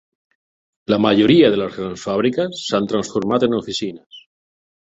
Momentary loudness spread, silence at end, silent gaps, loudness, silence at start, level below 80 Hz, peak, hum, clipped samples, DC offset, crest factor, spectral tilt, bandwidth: 13 LU; 0.75 s; 4.06-4.10 s; -18 LUFS; 0.9 s; -54 dBFS; -2 dBFS; none; under 0.1%; under 0.1%; 18 dB; -5.5 dB/octave; 8 kHz